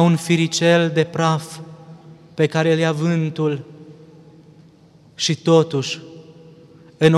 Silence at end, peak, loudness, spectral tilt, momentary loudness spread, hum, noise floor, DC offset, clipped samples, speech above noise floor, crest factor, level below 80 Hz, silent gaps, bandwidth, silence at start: 0 s; -2 dBFS; -19 LUFS; -5.5 dB/octave; 17 LU; none; -49 dBFS; under 0.1%; under 0.1%; 32 dB; 18 dB; -64 dBFS; none; 12 kHz; 0 s